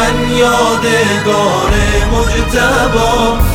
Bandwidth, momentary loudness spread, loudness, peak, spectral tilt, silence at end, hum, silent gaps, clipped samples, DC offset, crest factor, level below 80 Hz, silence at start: 18 kHz; 2 LU; -11 LUFS; 0 dBFS; -4.5 dB/octave; 0 s; none; none; under 0.1%; under 0.1%; 10 dB; -18 dBFS; 0 s